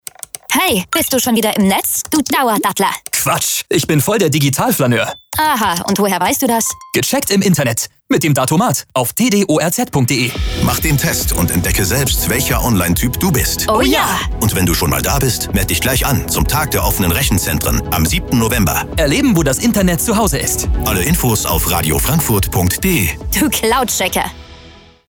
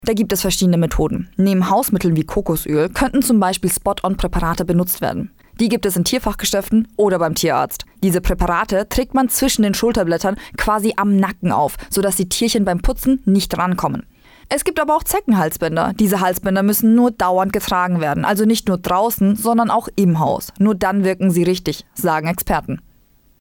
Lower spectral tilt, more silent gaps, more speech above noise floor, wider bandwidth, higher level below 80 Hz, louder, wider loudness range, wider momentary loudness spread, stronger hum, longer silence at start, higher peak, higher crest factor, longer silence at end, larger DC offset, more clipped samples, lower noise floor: about the same, -4 dB/octave vs -5 dB/octave; neither; second, 26 dB vs 37 dB; about the same, over 20 kHz vs over 20 kHz; first, -26 dBFS vs -32 dBFS; first, -14 LUFS vs -17 LUFS; about the same, 1 LU vs 2 LU; about the same, 3 LU vs 5 LU; neither; first, 0.5 s vs 0 s; first, -2 dBFS vs -6 dBFS; about the same, 12 dB vs 10 dB; second, 0.35 s vs 0.6 s; neither; neither; second, -40 dBFS vs -53 dBFS